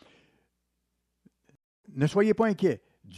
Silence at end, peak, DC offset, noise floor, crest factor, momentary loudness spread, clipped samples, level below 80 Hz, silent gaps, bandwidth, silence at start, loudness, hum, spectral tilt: 0 s; -12 dBFS; under 0.1%; -79 dBFS; 18 dB; 13 LU; under 0.1%; -68 dBFS; none; 12 kHz; 1.95 s; -26 LUFS; 60 Hz at -65 dBFS; -7.5 dB/octave